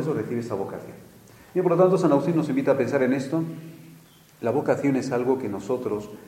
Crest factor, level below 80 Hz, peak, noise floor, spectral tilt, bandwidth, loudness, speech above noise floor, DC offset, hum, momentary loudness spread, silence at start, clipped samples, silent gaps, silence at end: 18 dB; -66 dBFS; -6 dBFS; -51 dBFS; -7.5 dB/octave; 16 kHz; -24 LUFS; 27 dB; under 0.1%; none; 14 LU; 0 s; under 0.1%; none; 0.05 s